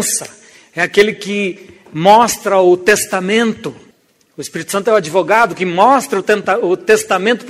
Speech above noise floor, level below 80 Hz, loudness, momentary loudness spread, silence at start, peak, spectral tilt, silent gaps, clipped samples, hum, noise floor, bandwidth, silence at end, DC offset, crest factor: 40 dB; -56 dBFS; -13 LUFS; 16 LU; 0 s; 0 dBFS; -3.5 dB/octave; none; under 0.1%; none; -53 dBFS; 16 kHz; 0 s; under 0.1%; 14 dB